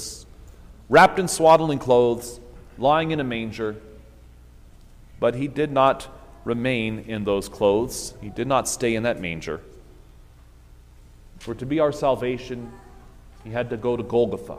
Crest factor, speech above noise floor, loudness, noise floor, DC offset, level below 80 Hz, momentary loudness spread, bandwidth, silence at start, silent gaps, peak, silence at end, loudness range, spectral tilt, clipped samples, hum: 20 dB; 27 dB; -22 LUFS; -48 dBFS; under 0.1%; -46 dBFS; 19 LU; 15.5 kHz; 0 s; none; -2 dBFS; 0 s; 9 LU; -5 dB/octave; under 0.1%; none